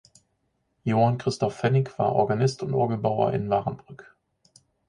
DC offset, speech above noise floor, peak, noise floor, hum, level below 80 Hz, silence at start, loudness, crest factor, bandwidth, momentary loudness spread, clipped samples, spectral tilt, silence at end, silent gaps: under 0.1%; 49 dB; -8 dBFS; -73 dBFS; none; -58 dBFS; 0.85 s; -25 LUFS; 18 dB; 10.5 kHz; 5 LU; under 0.1%; -7 dB/octave; 0.85 s; none